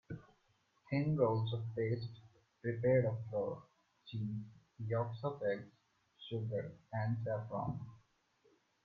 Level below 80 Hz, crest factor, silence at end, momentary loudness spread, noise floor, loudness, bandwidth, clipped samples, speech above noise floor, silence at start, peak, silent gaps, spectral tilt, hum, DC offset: -70 dBFS; 20 dB; 0.85 s; 17 LU; -76 dBFS; -39 LUFS; 4.8 kHz; under 0.1%; 39 dB; 0.1 s; -20 dBFS; none; -9.5 dB/octave; none; under 0.1%